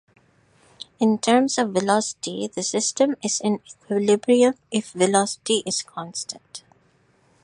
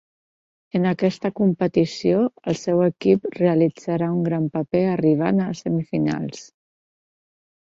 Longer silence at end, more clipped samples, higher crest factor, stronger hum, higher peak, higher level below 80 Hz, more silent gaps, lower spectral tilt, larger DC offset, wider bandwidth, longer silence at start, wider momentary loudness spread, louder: second, 0.85 s vs 1.3 s; neither; about the same, 20 dB vs 18 dB; neither; about the same, -2 dBFS vs -4 dBFS; second, -70 dBFS vs -60 dBFS; neither; second, -3.5 dB/octave vs -7.5 dB/octave; neither; first, 11 kHz vs 7.6 kHz; about the same, 0.8 s vs 0.75 s; first, 13 LU vs 6 LU; about the same, -22 LUFS vs -21 LUFS